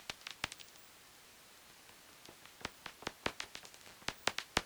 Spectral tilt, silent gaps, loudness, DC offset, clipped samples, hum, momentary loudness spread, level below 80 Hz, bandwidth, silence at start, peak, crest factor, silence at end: -2 dB/octave; none; -43 LUFS; under 0.1%; under 0.1%; none; 18 LU; -66 dBFS; over 20 kHz; 0 s; -18 dBFS; 28 dB; 0 s